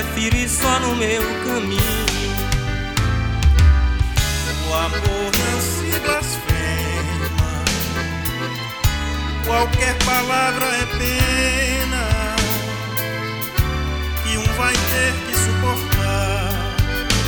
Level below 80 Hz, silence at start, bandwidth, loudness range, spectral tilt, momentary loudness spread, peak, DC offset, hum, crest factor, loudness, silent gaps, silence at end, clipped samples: -24 dBFS; 0 s; over 20 kHz; 3 LU; -4 dB/octave; 6 LU; 0 dBFS; under 0.1%; none; 18 dB; -19 LUFS; none; 0 s; under 0.1%